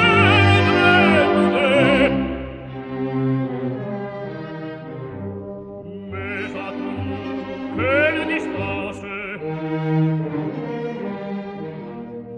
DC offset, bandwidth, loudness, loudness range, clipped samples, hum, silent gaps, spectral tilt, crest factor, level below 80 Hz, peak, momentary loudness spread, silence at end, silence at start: under 0.1%; 9.4 kHz; -20 LUFS; 12 LU; under 0.1%; none; none; -7 dB/octave; 18 dB; -46 dBFS; -2 dBFS; 18 LU; 0 s; 0 s